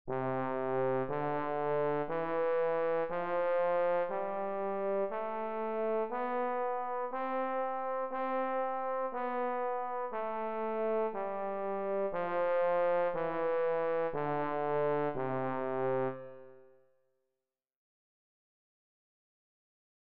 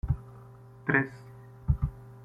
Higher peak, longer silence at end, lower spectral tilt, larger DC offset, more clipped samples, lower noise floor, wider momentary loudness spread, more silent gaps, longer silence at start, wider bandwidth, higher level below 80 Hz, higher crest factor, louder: second, -22 dBFS vs -8 dBFS; first, 2.2 s vs 0 s; second, -5.5 dB/octave vs -9.5 dB/octave; first, 0.4% vs under 0.1%; neither; first, -90 dBFS vs -50 dBFS; second, 5 LU vs 23 LU; neither; about the same, 0.05 s vs 0.05 s; second, 4.6 kHz vs 5.4 kHz; second, -70 dBFS vs -38 dBFS; second, 12 dB vs 24 dB; second, -34 LUFS vs -31 LUFS